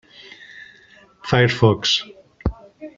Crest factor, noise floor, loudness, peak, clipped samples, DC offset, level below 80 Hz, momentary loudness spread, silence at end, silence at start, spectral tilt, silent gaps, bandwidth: 20 dB; -50 dBFS; -19 LUFS; -2 dBFS; under 0.1%; under 0.1%; -38 dBFS; 24 LU; 0.1 s; 0.55 s; -5 dB/octave; none; 7.6 kHz